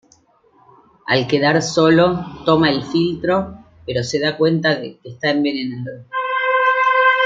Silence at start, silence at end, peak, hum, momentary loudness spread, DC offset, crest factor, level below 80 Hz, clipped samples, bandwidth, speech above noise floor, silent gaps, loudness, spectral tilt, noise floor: 1.05 s; 0 s; -2 dBFS; none; 13 LU; under 0.1%; 16 dB; -52 dBFS; under 0.1%; 7.8 kHz; 38 dB; none; -17 LUFS; -5 dB/octave; -55 dBFS